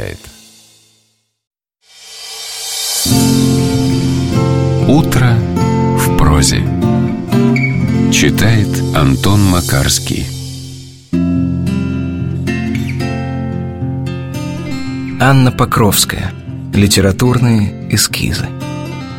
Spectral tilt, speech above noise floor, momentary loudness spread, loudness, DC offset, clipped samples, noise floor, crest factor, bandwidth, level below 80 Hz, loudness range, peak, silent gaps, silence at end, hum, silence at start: -5 dB/octave; 48 dB; 12 LU; -13 LUFS; under 0.1%; under 0.1%; -59 dBFS; 14 dB; 16.5 kHz; -28 dBFS; 6 LU; 0 dBFS; 1.47-1.51 s; 0 s; none; 0 s